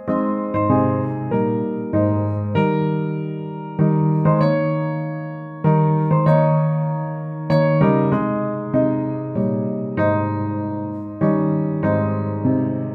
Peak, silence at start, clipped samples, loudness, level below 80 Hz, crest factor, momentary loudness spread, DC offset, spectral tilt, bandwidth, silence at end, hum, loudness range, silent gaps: -4 dBFS; 0 s; under 0.1%; -20 LUFS; -54 dBFS; 16 dB; 9 LU; under 0.1%; -11.5 dB/octave; 4.9 kHz; 0 s; none; 3 LU; none